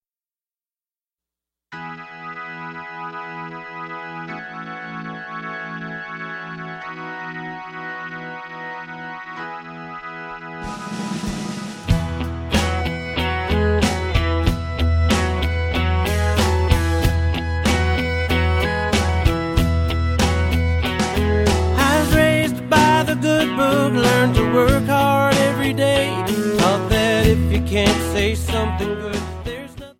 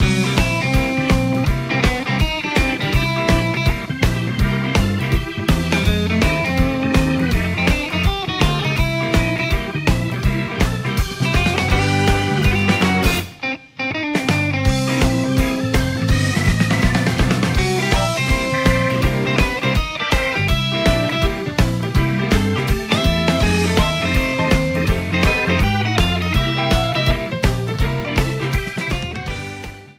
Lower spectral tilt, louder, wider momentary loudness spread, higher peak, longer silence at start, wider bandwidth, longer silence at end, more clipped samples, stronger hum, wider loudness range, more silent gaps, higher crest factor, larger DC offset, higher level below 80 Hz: about the same, -5.5 dB/octave vs -5.5 dB/octave; about the same, -19 LUFS vs -18 LUFS; first, 15 LU vs 4 LU; about the same, -2 dBFS vs 0 dBFS; first, 1.7 s vs 0 s; about the same, 16.5 kHz vs 16 kHz; about the same, 0.05 s vs 0.05 s; neither; neither; first, 15 LU vs 2 LU; neither; about the same, 18 dB vs 16 dB; neither; about the same, -28 dBFS vs -24 dBFS